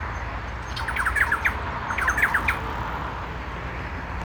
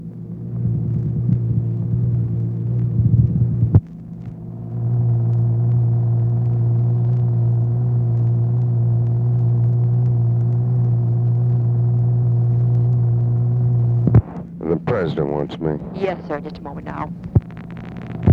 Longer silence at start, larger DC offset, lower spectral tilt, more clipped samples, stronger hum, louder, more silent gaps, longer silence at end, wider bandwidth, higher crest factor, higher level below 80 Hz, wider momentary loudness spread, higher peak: about the same, 0 s vs 0 s; neither; second, -4.5 dB/octave vs -11.5 dB/octave; neither; neither; second, -25 LUFS vs -19 LUFS; neither; about the same, 0 s vs 0 s; first, over 20 kHz vs 3.8 kHz; about the same, 18 dB vs 18 dB; about the same, -36 dBFS vs -38 dBFS; about the same, 11 LU vs 12 LU; second, -8 dBFS vs 0 dBFS